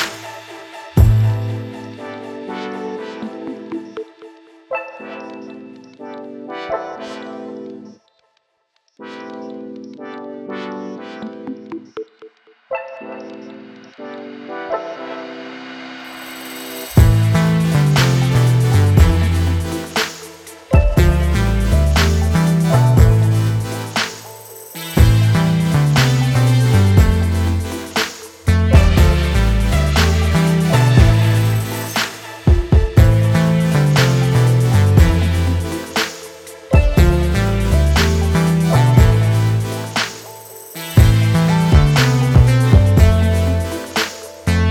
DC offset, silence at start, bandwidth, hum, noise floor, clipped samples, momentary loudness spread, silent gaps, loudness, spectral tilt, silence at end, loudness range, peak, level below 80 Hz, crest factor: under 0.1%; 0 s; 17 kHz; none; -66 dBFS; under 0.1%; 20 LU; none; -15 LUFS; -6 dB/octave; 0 s; 17 LU; 0 dBFS; -22 dBFS; 14 dB